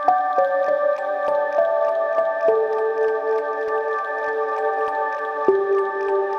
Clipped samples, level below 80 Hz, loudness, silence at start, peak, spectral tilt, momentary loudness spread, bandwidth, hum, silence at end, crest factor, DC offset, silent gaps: under 0.1%; -72 dBFS; -21 LUFS; 0 s; -4 dBFS; -5 dB/octave; 4 LU; 6.6 kHz; none; 0 s; 16 dB; under 0.1%; none